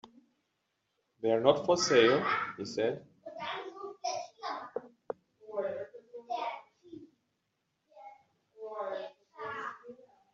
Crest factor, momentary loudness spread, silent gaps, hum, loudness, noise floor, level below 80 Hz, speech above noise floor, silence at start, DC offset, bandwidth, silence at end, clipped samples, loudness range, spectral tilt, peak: 24 dB; 24 LU; none; none; -32 LUFS; -81 dBFS; -76 dBFS; 53 dB; 0.05 s; under 0.1%; 7.6 kHz; 0.4 s; under 0.1%; 15 LU; -2.5 dB/octave; -10 dBFS